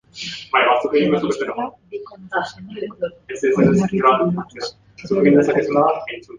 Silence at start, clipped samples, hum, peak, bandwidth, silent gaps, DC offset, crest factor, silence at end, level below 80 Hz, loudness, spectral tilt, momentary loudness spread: 0.15 s; under 0.1%; none; -2 dBFS; 9.6 kHz; none; under 0.1%; 16 dB; 0 s; -54 dBFS; -18 LUFS; -6.5 dB/octave; 16 LU